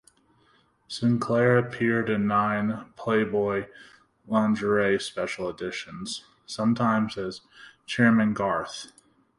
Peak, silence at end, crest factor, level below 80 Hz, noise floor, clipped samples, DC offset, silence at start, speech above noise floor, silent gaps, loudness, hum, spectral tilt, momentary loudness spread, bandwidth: -6 dBFS; 0.55 s; 20 dB; -60 dBFS; -64 dBFS; under 0.1%; under 0.1%; 0.9 s; 38 dB; none; -25 LUFS; none; -6 dB/octave; 15 LU; 11.5 kHz